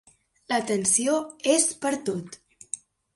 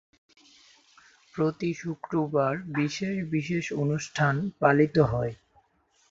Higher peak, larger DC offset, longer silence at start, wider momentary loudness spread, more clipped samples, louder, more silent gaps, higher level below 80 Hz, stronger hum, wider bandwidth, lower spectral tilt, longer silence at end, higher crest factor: about the same, -8 dBFS vs -6 dBFS; neither; second, 0.5 s vs 1.35 s; first, 15 LU vs 9 LU; neither; first, -24 LUFS vs -27 LUFS; neither; second, -70 dBFS vs -56 dBFS; neither; first, 12 kHz vs 7.8 kHz; second, -2.5 dB/octave vs -6.5 dB/octave; second, 0.4 s vs 0.75 s; about the same, 20 dB vs 22 dB